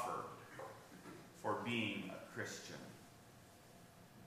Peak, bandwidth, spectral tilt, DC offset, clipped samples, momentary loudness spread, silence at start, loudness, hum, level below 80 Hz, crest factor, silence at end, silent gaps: -26 dBFS; 15.5 kHz; -4 dB/octave; under 0.1%; under 0.1%; 21 LU; 0 s; -46 LUFS; none; -80 dBFS; 20 dB; 0 s; none